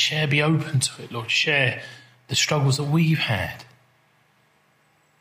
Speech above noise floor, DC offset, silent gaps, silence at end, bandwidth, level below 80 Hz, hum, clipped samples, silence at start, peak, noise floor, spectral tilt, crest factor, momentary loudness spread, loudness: 40 dB; under 0.1%; none; 1.55 s; 16 kHz; -60 dBFS; none; under 0.1%; 0 s; -6 dBFS; -62 dBFS; -4 dB/octave; 18 dB; 13 LU; -22 LUFS